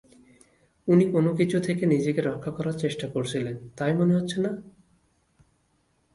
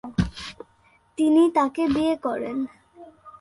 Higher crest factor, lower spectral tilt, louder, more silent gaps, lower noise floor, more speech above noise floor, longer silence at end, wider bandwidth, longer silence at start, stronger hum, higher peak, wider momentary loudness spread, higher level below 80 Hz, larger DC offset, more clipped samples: about the same, 18 dB vs 16 dB; about the same, -7 dB/octave vs -7 dB/octave; about the same, -25 LUFS vs -23 LUFS; neither; first, -69 dBFS vs -60 dBFS; first, 44 dB vs 39 dB; first, 1.45 s vs 0.1 s; about the same, 11.5 kHz vs 11.5 kHz; first, 0.85 s vs 0.05 s; neither; about the same, -8 dBFS vs -8 dBFS; second, 9 LU vs 18 LU; second, -62 dBFS vs -44 dBFS; neither; neither